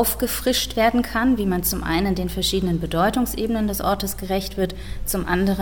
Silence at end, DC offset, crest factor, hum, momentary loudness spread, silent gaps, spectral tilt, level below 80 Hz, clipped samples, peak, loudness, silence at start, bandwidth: 0 s; 0.9%; 16 dB; none; 6 LU; none; -4.5 dB/octave; -34 dBFS; under 0.1%; -6 dBFS; -22 LUFS; 0 s; 19 kHz